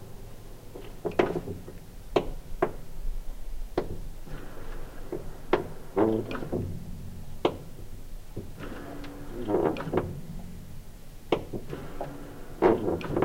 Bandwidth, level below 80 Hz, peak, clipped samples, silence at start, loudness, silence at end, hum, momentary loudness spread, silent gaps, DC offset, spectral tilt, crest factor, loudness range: 16 kHz; -40 dBFS; -8 dBFS; under 0.1%; 0 s; -32 LUFS; 0 s; none; 19 LU; none; under 0.1%; -7 dB/octave; 24 dB; 4 LU